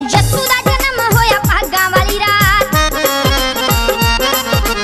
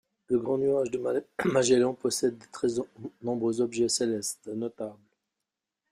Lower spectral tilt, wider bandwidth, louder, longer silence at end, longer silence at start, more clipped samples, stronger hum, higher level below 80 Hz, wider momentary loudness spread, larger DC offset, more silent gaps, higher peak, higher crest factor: about the same, -3.5 dB/octave vs -4 dB/octave; about the same, 16 kHz vs 15.5 kHz; first, -12 LUFS vs -28 LUFS; second, 0 s vs 1 s; second, 0 s vs 0.3 s; neither; neither; first, -22 dBFS vs -68 dBFS; second, 3 LU vs 12 LU; neither; neither; first, 0 dBFS vs -10 dBFS; second, 12 dB vs 18 dB